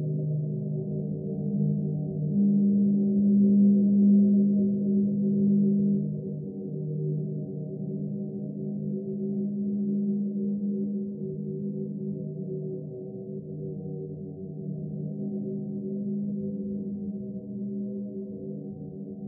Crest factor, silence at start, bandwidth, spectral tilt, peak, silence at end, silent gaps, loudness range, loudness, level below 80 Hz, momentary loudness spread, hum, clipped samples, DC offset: 14 dB; 0 s; 0.8 kHz; -19.5 dB/octave; -14 dBFS; 0 s; none; 13 LU; -28 LUFS; -70 dBFS; 15 LU; none; under 0.1%; under 0.1%